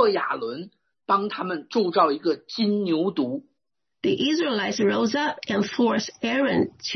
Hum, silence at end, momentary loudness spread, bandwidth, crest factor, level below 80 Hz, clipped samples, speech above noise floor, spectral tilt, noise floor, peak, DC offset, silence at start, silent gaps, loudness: none; 0 s; 8 LU; 6.4 kHz; 18 dB; -68 dBFS; under 0.1%; 60 dB; -5 dB/octave; -83 dBFS; -6 dBFS; under 0.1%; 0 s; none; -24 LUFS